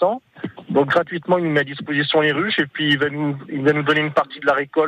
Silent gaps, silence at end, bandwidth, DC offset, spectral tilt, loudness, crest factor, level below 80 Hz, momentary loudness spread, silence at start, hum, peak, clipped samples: none; 0 s; 9.4 kHz; under 0.1%; -7 dB/octave; -19 LUFS; 16 dB; -62 dBFS; 7 LU; 0 s; none; -4 dBFS; under 0.1%